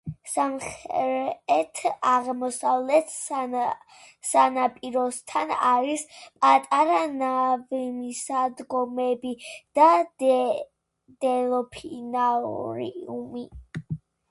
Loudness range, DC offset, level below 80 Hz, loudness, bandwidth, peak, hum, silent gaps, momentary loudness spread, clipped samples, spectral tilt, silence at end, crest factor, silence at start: 3 LU; under 0.1%; -62 dBFS; -25 LUFS; 11.5 kHz; -4 dBFS; none; none; 16 LU; under 0.1%; -4 dB/octave; 0.35 s; 20 dB; 0.05 s